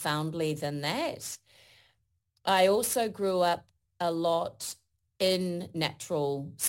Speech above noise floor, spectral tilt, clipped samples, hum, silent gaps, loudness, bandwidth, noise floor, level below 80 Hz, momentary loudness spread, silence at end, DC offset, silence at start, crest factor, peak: 46 dB; -4 dB/octave; under 0.1%; none; none; -30 LUFS; 17 kHz; -76 dBFS; -68 dBFS; 13 LU; 0 s; under 0.1%; 0 s; 18 dB; -12 dBFS